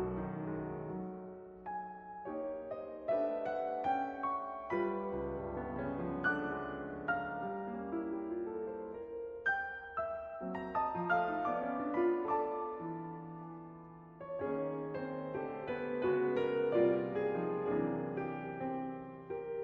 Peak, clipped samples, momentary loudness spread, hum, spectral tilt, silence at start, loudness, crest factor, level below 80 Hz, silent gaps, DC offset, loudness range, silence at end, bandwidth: -18 dBFS; under 0.1%; 11 LU; none; -6 dB/octave; 0 s; -38 LUFS; 18 dB; -64 dBFS; none; under 0.1%; 6 LU; 0 s; 5.2 kHz